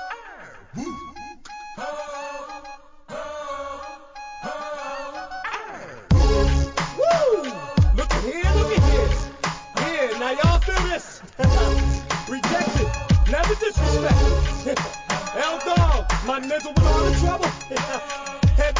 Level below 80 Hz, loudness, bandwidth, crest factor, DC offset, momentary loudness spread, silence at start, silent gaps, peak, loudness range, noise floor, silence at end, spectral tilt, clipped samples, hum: -24 dBFS; -22 LUFS; 7.6 kHz; 16 dB; under 0.1%; 17 LU; 0 s; none; -6 dBFS; 12 LU; -42 dBFS; 0 s; -5.5 dB/octave; under 0.1%; none